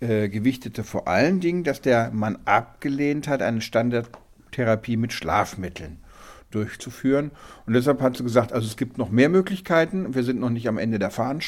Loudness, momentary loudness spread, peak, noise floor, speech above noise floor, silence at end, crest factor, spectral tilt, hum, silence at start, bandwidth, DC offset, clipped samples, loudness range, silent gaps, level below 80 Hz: -23 LUFS; 11 LU; -2 dBFS; -46 dBFS; 23 dB; 0 s; 20 dB; -6.5 dB/octave; none; 0 s; 16 kHz; under 0.1%; under 0.1%; 4 LU; none; -52 dBFS